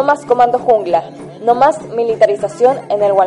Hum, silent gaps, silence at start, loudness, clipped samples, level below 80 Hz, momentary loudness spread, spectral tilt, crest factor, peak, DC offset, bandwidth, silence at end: none; none; 0 s; -14 LUFS; under 0.1%; -54 dBFS; 6 LU; -5.5 dB/octave; 12 dB; 0 dBFS; under 0.1%; 11 kHz; 0 s